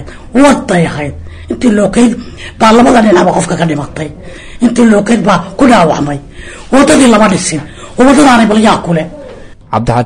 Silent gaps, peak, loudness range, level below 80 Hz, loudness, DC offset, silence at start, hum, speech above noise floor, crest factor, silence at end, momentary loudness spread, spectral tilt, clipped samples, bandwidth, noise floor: none; 0 dBFS; 2 LU; -32 dBFS; -8 LUFS; under 0.1%; 0 s; none; 22 dB; 8 dB; 0 s; 18 LU; -5 dB/octave; 1%; 10.5 kHz; -29 dBFS